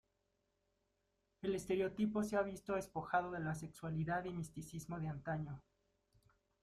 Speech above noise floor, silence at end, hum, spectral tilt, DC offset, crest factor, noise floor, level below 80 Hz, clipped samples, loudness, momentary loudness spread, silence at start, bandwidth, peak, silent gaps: 43 dB; 1 s; none; -6.5 dB/octave; under 0.1%; 20 dB; -84 dBFS; -68 dBFS; under 0.1%; -42 LUFS; 9 LU; 1.45 s; 14.5 kHz; -22 dBFS; none